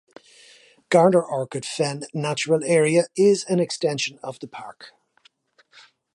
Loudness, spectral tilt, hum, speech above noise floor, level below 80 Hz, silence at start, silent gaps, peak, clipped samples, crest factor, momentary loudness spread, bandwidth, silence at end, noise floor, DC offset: -21 LUFS; -5 dB/octave; none; 39 dB; -74 dBFS; 0.9 s; none; -4 dBFS; under 0.1%; 20 dB; 18 LU; 11.5 kHz; 1.25 s; -61 dBFS; under 0.1%